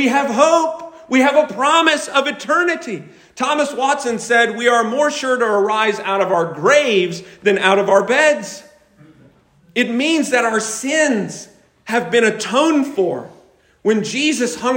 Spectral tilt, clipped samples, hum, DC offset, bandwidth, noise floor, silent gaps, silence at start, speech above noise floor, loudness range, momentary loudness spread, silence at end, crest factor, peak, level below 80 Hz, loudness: -3 dB/octave; under 0.1%; none; under 0.1%; 16.5 kHz; -51 dBFS; none; 0 s; 35 dB; 3 LU; 9 LU; 0 s; 16 dB; 0 dBFS; -64 dBFS; -16 LUFS